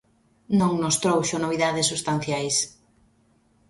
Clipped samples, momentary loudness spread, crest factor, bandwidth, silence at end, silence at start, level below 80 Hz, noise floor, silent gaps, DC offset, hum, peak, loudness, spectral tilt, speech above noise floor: under 0.1%; 4 LU; 18 dB; 12 kHz; 1 s; 0.5 s; -60 dBFS; -63 dBFS; none; under 0.1%; none; -8 dBFS; -23 LUFS; -4 dB/octave; 39 dB